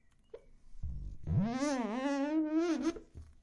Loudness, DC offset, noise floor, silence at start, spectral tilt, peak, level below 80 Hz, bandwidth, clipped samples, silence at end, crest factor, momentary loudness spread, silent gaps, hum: -35 LUFS; under 0.1%; -56 dBFS; 0.35 s; -6.5 dB/octave; -22 dBFS; -50 dBFS; 11 kHz; under 0.1%; 0.15 s; 14 dB; 15 LU; none; none